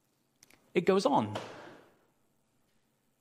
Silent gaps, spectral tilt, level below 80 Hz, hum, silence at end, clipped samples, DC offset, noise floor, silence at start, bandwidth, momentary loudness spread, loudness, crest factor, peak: none; -6 dB/octave; -78 dBFS; none; 1.45 s; under 0.1%; under 0.1%; -74 dBFS; 0.75 s; 15 kHz; 19 LU; -30 LUFS; 22 dB; -14 dBFS